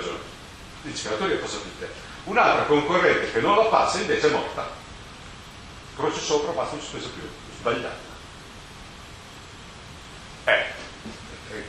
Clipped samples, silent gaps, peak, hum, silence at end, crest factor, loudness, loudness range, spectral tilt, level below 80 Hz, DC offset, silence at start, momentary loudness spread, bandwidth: under 0.1%; none; -4 dBFS; none; 0 s; 22 dB; -24 LUFS; 12 LU; -3.5 dB/octave; -50 dBFS; under 0.1%; 0 s; 22 LU; 12 kHz